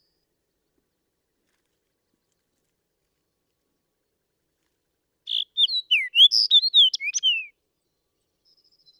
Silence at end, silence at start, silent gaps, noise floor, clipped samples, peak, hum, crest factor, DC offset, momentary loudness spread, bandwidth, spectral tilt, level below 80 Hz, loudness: 1.55 s; 5.25 s; none; -77 dBFS; under 0.1%; -6 dBFS; none; 20 dB; under 0.1%; 13 LU; 17.5 kHz; 7 dB/octave; -86 dBFS; -17 LUFS